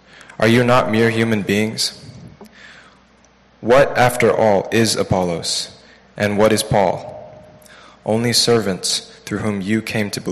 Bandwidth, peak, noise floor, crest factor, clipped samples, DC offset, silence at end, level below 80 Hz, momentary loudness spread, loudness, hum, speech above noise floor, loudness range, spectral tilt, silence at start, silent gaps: 14 kHz; -4 dBFS; -52 dBFS; 14 dB; under 0.1%; under 0.1%; 0 s; -50 dBFS; 14 LU; -17 LUFS; none; 35 dB; 3 LU; -4.5 dB/octave; 0.4 s; none